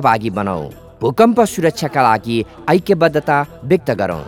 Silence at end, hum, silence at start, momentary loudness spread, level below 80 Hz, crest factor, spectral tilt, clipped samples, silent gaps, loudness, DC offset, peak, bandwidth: 0 s; none; 0 s; 9 LU; -46 dBFS; 16 dB; -6 dB/octave; under 0.1%; none; -16 LUFS; under 0.1%; 0 dBFS; 17.5 kHz